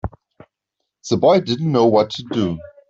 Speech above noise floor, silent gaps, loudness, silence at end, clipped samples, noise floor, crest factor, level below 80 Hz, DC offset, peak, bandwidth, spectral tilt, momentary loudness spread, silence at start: 62 dB; none; -17 LUFS; 0.25 s; under 0.1%; -78 dBFS; 16 dB; -46 dBFS; under 0.1%; -2 dBFS; 7.8 kHz; -6.5 dB/octave; 11 LU; 0.05 s